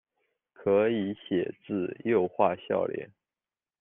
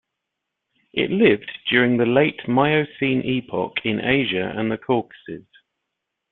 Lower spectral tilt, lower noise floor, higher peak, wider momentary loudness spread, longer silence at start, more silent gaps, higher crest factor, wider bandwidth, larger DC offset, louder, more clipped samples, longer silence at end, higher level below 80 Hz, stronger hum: second, -5.5 dB/octave vs -10 dB/octave; first, under -90 dBFS vs -81 dBFS; second, -10 dBFS vs -2 dBFS; about the same, 9 LU vs 9 LU; second, 0.6 s vs 0.95 s; neither; about the same, 20 dB vs 20 dB; second, 3.8 kHz vs 4.2 kHz; neither; second, -29 LUFS vs -20 LUFS; neither; second, 0.75 s vs 0.9 s; second, -72 dBFS vs -58 dBFS; neither